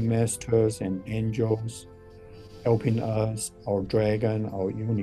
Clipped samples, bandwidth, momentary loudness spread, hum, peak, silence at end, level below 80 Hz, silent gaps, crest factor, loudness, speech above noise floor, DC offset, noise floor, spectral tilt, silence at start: under 0.1%; 12.5 kHz; 8 LU; none; -10 dBFS; 0 s; -52 dBFS; none; 16 dB; -27 LUFS; 20 dB; under 0.1%; -46 dBFS; -6.5 dB/octave; 0 s